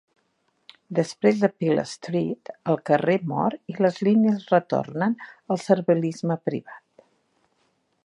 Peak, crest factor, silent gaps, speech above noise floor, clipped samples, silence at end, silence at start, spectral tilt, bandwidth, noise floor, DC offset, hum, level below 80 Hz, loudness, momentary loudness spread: -4 dBFS; 20 dB; none; 47 dB; under 0.1%; 1.3 s; 0.9 s; -7 dB/octave; 11 kHz; -70 dBFS; under 0.1%; none; -72 dBFS; -24 LUFS; 9 LU